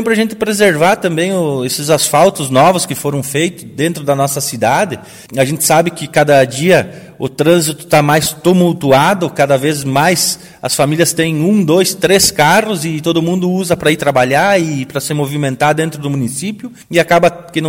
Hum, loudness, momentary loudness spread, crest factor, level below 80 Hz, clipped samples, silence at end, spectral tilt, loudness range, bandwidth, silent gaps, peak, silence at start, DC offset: none; -12 LUFS; 8 LU; 12 dB; -48 dBFS; 0.1%; 0 s; -4.5 dB/octave; 3 LU; 17.5 kHz; none; 0 dBFS; 0 s; under 0.1%